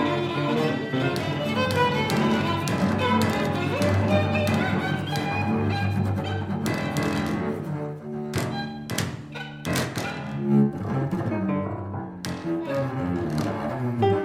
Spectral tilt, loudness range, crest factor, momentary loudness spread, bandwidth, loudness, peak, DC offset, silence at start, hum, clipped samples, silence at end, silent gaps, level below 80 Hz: -6 dB/octave; 5 LU; 16 dB; 9 LU; 16 kHz; -26 LUFS; -8 dBFS; under 0.1%; 0 s; none; under 0.1%; 0 s; none; -52 dBFS